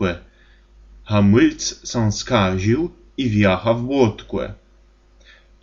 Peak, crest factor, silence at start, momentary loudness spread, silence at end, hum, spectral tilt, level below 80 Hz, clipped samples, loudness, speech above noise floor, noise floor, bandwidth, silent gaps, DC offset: -2 dBFS; 18 dB; 0 s; 12 LU; 1.1 s; none; -6 dB/octave; -42 dBFS; under 0.1%; -19 LUFS; 34 dB; -52 dBFS; 7.6 kHz; none; under 0.1%